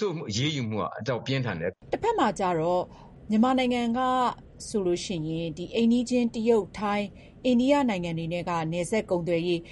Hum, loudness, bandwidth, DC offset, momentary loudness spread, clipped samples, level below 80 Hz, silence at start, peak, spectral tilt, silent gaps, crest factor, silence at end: none; -27 LUFS; 11.5 kHz; under 0.1%; 8 LU; under 0.1%; -54 dBFS; 0 s; -10 dBFS; -5.5 dB/octave; none; 16 dB; 0 s